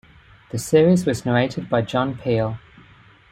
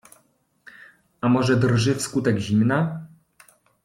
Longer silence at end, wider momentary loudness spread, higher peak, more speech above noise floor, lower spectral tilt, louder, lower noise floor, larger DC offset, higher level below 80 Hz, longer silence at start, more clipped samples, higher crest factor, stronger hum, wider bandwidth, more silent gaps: about the same, 0.75 s vs 0.8 s; first, 13 LU vs 8 LU; about the same, -4 dBFS vs -6 dBFS; second, 30 dB vs 43 dB; about the same, -6.5 dB/octave vs -6 dB/octave; about the same, -20 LUFS vs -21 LUFS; second, -50 dBFS vs -63 dBFS; neither; about the same, -52 dBFS vs -56 dBFS; second, 0.55 s vs 1.25 s; neither; about the same, 18 dB vs 16 dB; neither; first, 16 kHz vs 14.5 kHz; neither